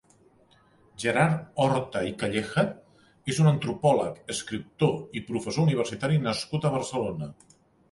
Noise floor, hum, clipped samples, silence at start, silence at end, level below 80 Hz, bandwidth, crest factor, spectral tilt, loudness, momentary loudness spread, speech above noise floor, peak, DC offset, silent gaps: -60 dBFS; none; under 0.1%; 1 s; 0.6 s; -58 dBFS; 11.5 kHz; 20 dB; -6 dB/octave; -27 LUFS; 10 LU; 34 dB; -8 dBFS; under 0.1%; none